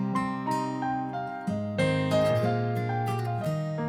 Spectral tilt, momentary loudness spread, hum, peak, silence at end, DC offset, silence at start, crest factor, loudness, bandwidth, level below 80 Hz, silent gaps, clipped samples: -7 dB/octave; 7 LU; none; -14 dBFS; 0 s; under 0.1%; 0 s; 14 dB; -28 LUFS; 15.5 kHz; -60 dBFS; none; under 0.1%